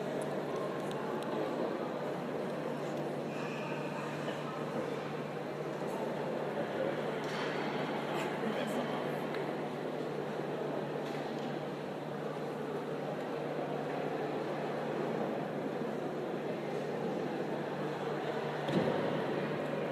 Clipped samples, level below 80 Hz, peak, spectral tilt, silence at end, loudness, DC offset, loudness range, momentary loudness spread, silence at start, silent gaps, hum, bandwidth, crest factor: under 0.1%; -76 dBFS; -18 dBFS; -6.5 dB/octave; 0 s; -37 LUFS; under 0.1%; 2 LU; 3 LU; 0 s; none; none; 15.5 kHz; 18 dB